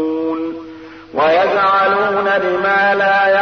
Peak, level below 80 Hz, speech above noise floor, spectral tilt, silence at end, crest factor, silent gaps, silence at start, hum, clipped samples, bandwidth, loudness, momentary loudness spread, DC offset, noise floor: -4 dBFS; -58 dBFS; 21 dB; -5.5 dB/octave; 0 s; 12 dB; none; 0 s; none; under 0.1%; 6.4 kHz; -14 LUFS; 13 LU; 0.1%; -34 dBFS